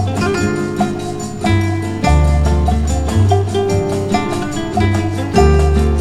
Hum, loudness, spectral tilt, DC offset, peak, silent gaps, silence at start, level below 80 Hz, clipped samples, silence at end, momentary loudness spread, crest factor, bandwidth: none; -15 LUFS; -6.5 dB/octave; under 0.1%; 0 dBFS; none; 0 s; -20 dBFS; under 0.1%; 0 s; 6 LU; 14 dB; 12 kHz